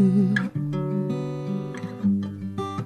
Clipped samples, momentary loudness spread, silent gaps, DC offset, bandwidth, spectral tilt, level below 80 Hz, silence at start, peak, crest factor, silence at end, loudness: under 0.1%; 9 LU; none; under 0.1%; 9.2 kHz; -8.5 dB/octave; -64 dBFS; 0 s; -10 dBFS; 14 dB; 0 s; -26 LUFS